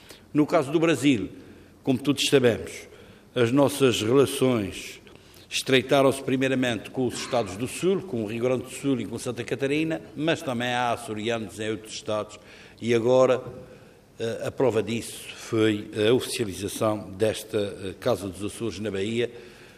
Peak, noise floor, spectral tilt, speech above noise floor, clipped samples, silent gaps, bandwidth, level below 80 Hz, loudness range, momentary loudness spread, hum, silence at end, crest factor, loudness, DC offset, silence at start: -6 dBFS; -50 dBFS; -5 dB/octave; 25 dB; under 0.1%; none; 15.5 kHz; -62 dBFS; 5 LU; 12 LU; none; 0.1 s; 20 dB; -25 LUFS; under 0.1%; 0.1 s